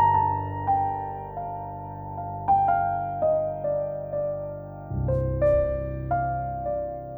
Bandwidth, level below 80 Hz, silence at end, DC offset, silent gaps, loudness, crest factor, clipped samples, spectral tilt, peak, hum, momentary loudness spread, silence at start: over 20 kHz; -40 dBFS; 0 s; under 0.1%; none; -27 LUFS; 14 dB; under 0.1%; -11 dB/octave; -12 dBFS; none; 12 LU; 0 s